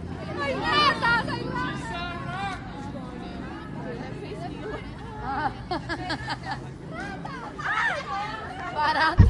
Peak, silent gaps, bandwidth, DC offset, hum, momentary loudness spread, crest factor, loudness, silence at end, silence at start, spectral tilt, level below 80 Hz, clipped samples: -4 dBFS; none; 11.5 kHz; under 0.1%; none; 14 LU; 24 dB; -29 LUFS; 0 s; 0 s; -5.5 dB/octave; -40 dBFS; under 0.1%